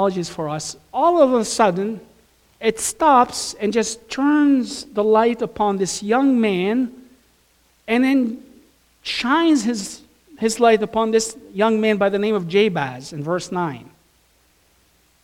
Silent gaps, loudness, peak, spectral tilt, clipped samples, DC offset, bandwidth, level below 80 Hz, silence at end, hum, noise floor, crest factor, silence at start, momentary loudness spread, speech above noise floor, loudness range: none; -19 LUFS; -2 dBFS; -4.5 dB/octave; under 0.1%; under 0.1%; 16 kHz; -56 dBFS; 1.4 s; none; -59 dBFS; 18 dB; 0 s; 12 LU; 40 dB; 3 LU